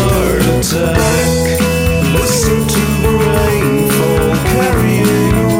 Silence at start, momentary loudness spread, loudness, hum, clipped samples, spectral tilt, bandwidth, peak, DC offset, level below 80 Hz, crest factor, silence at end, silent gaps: 0 s; 1 LU; -12 LUFS; none; under 0.1%; -5 dB/octave; 16.5 kHz; 0 dBFS; 0.1%; -22 dBFS; 10 dB; 0 s; none